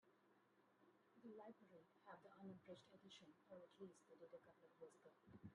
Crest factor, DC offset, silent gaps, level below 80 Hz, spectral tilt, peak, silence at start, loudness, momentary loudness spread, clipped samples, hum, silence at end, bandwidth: 18 dB; under 0.1%; none; under -90 dBFS; -5.5 dB/octave; -48 dBFS; 0 s; -65 LUFS; 5 LU; under 0.1%; none; 0 s; 10 kHz